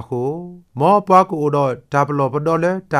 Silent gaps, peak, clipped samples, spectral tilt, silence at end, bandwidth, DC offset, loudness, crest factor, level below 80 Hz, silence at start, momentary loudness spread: none; 0 dBFS; under 0.1%; -7.5 dB/octave; 0 s; 13 kHz; under 0.1%; -17 LUFS; 16 dB; -58 dBFS; 0 s; 11 LU